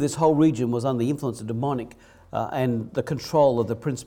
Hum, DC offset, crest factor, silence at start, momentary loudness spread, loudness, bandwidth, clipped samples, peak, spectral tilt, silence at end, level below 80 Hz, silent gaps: none; under 0.1%; 16 dB; 0 s; 10 LU; -24 LUFS; 16.5 kHz; under 0.1%; -8 dBFS; -7 dB/octave; 0.05 s; -56 dBFS; none